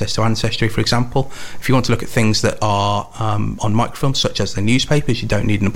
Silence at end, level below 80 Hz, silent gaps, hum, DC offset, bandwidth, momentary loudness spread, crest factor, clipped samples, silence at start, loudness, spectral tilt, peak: 0 s; -34 dBFS; none; none; 3%; 16.5 kHz; 5 LU; 16 dB; under 0.1%; 0 s; -18 LUFS; -5 dB/octave; 0 dBFS